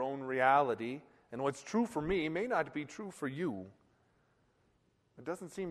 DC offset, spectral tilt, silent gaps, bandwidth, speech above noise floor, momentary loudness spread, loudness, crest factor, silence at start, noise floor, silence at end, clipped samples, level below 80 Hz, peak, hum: under 0.1%; -5.5 dB/octave; none; 13 kHz; 39 dB; 18 LU; -35 LUFS; 22 dB; 0 s; -74 dBFS; 0 s; under 0.1%; -64 dBFS; -14 dBFS; none